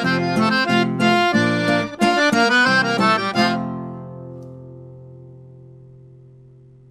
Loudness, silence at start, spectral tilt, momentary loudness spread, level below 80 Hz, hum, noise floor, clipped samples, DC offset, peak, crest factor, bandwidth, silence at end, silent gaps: -17 LUFS; 0 s; -5 dB/octave; 21 LU; -60 dBFS; none; -46 dBFS; under 0.1%; under 0.1%; -4 dBFS; 16 dB; 14 kHz; 1.4 s; none